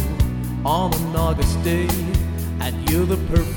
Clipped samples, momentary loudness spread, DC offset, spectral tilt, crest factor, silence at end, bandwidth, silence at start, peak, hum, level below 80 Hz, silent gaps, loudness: under 0.1%; 5 LU; under 0.1%; -6 dB/octave; 14 dB; 0 s; over 20 kHz; 0 s; -4 dBFS; none; -26 dBFS; none; -21 LUFS